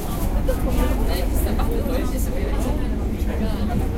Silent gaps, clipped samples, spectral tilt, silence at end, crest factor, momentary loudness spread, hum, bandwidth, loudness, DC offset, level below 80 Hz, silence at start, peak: none; under 0.1%; -6.5 dB/octave; 0 s; 12 dB; 3 LU; none; 16 kHz; -24 LUFS; under 0.1%; -22 dBFS; 0 s; -8 dBFS